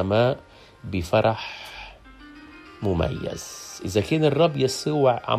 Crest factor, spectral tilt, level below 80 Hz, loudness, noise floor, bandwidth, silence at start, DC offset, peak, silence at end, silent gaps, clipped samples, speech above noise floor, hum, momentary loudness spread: 18 dB; -5.5 dB/octave; -48 dBFS; -24 LUFS; -46 dBFS; 15 kHz; 0 s; under 0.1%; -6 dBFS; 0 s; none; under 0.1%; 23 dB; none; 20 LU